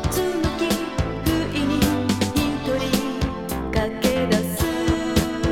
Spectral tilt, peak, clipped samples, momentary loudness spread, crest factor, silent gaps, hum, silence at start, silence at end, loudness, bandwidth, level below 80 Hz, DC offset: -5 dB/octave; -4 dBFS; under 0.1%; 4 LU; 18 dB; none; none; 0 s; 0 s; -22 LUFS; 18.5 kHz; -34 dBFS; under 0.1%